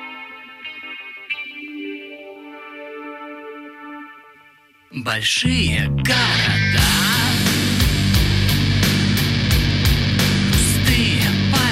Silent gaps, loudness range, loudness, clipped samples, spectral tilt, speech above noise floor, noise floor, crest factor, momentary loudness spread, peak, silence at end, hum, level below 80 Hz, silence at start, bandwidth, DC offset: none; 15 LU; -17 LUFS; under 0.1%; -4 dB/octave; 34 dB; -51 dBFS; 16 dB; 20 LU; -4 dBFS; 0 s; none; -30 dBFS; 0 s; 16.5 kHz; under 0.1%